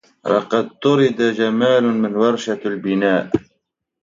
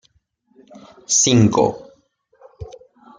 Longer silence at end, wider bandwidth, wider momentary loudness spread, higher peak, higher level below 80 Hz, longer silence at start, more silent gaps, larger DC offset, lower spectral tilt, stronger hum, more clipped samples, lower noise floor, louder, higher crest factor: first, 0.65 s vs 0.5 s; second, 7.6 kHz vs 10.5 kHz; second, 7 LU vs 25 LU; about the same, -2 dBFS vs -2 dBFS; about the same, -56 dBFS vs -52 dBFS; second, 0.25 s vs 1.1 s; neither; neither; first, -6 dB/octave vs -4 dB/octave; neither; neither; first, -73 dBFS vs -63 dBFS; second, -18 LUFS vs -15 LUFS; about the same, 16 dB vs 18 dB